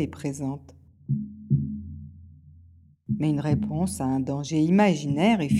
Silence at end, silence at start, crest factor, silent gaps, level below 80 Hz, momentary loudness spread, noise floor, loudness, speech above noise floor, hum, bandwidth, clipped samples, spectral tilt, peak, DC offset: 0 s; 0 s; 18 dB; none; -52 dBFS; 20 LU; -54 dBFS; -26 LUFS; 30 dB; none; 13 kHz; under 0.1%; -7 dB/octave; -8 dBFS; under 0.1%